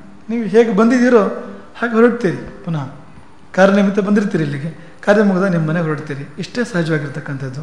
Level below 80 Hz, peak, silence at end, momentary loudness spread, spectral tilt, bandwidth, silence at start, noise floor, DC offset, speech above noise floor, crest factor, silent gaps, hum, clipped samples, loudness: -52 dBFS; 0 dBFS; 0 s; 14 LU; -7 dB/octave; 10.5 kHz; 0.05 s; -43 dBFS; 1%; 27 dB; 16 dB; none; none; under 0.1%; -16 LUFS